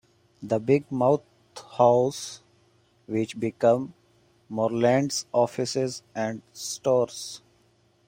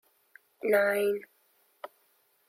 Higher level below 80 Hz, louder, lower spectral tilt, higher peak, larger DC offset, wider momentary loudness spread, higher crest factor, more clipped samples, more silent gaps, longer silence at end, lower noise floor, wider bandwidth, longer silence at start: first, -68 dBFS vs -86 dBFS; first, -25 LUFS vs -28 LUFS; about the same, -5 dB/octave vs -4 dB/octave; first, -6 dBFS vs -14 dBFS; neither; second, 17 LU vs 23 LU; about the same, 20 dB vs 18 dB; neither; neither; second, 0.7 s vs 1.25 s; second, -64 dBFS vs -69 dBFS; about the same, 16 kHz vs 16 kHz; second, 0.4 s vs 0.65 s